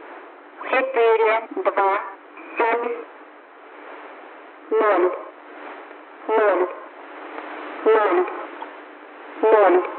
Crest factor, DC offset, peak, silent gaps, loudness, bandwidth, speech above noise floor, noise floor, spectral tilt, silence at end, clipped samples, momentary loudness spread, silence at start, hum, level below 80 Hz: 18 dB; under 0.1%; -4 dBFS; none; -20 LUFS; 4.3 kHz; 26 dB; -44 dBFS; 1 dB/octave; 0 s; under 0.1%; 23 LU; 0 s; none; under -90 dBFS